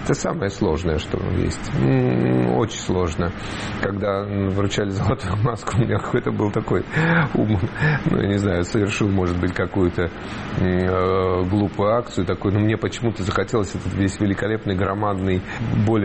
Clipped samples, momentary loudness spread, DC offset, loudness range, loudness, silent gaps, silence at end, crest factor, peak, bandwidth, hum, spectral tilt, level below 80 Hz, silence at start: under 0.1%; 5 LU; 0.1%; 2 LU; -21 LUFS; none; 0 s; 14 dB; -8 dBFS; 8.8 kHz; none; -6.5 dB/octave; -38 dBFS; 0 s